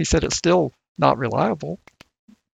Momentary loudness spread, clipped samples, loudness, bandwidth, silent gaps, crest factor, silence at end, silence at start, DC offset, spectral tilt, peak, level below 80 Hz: 12 LU; under 0.1%; -21 LUFS; 9.4 kHz; 0.88-0.95 s; 20 dB; 0.8 s; 0 s; under 0.1%; -5 dB/octave; -2 dBFS; -36 dBFS